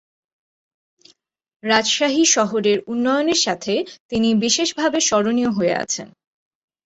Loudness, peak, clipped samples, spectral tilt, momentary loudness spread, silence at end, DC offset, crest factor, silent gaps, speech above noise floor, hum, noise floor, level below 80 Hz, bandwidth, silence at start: -18 LUFS; -4 dBFS; under 0.1%; -2.5 dB/octave; 8 LU; 0.75 s; under 0.1%; 18 dB; 4.00-4.09 s; 36 dB; none; -55 dBFS; -58 dBFS; 8.2 kHz; 1.65 s